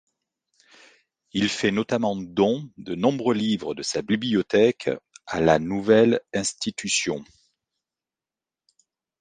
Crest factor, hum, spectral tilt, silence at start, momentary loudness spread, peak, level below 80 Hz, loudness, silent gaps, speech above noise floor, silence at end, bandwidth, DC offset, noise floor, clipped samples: 20 dB; none; -4.5 dB/octave; 1.35 s; 10 LU; -4 dBFS; -58 dBFS; -23 LUFS; none; over 67 dB; 1.95 s; 10 kHz; under 0.1%; under -90 dBFS; under 0.1%